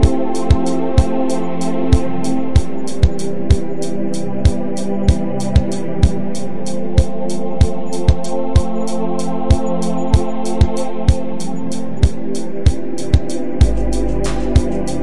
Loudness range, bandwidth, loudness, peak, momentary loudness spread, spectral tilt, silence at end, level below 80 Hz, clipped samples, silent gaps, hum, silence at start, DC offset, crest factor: 1 LU; 11.5 kHz; -18 LUFS; 0 dBFS; 7 LU; -7 dB/octave; 0 s; -22 dBFS; under 0.1%; none; none; 0 s; 20%; 18 dB